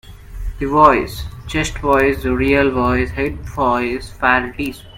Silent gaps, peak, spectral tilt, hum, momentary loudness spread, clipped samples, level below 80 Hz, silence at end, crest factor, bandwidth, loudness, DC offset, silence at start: none; 0 dBFS; -5.5 dB/octave; none; 13 LU; under 0.1%; -30 dBFS; 0 s; 18 dB; 16.5 kHz; -17 LUFS; under 0.1%; 0.05 s